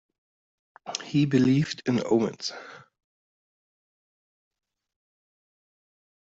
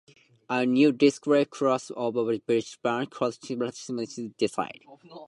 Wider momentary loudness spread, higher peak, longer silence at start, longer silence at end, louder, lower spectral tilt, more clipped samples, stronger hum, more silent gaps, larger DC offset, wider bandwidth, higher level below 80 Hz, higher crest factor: first, 20 LU vs 12 LU; about the same, -10 dBFS vs -8 dBFS; first, 0.85 s vs 0.5 s; first, 3.45 s vs 0 s; about the same, -26 LUFS vs -27 LUFS; about the same, -6 dB/octave vs -5.5 dB/octave; neither; neither; neither; neither; second, 8 kHz vs 11.5 kHz; first, -66 dBFS vs -74 dBFS; about the same, 20 dB vs 18 dB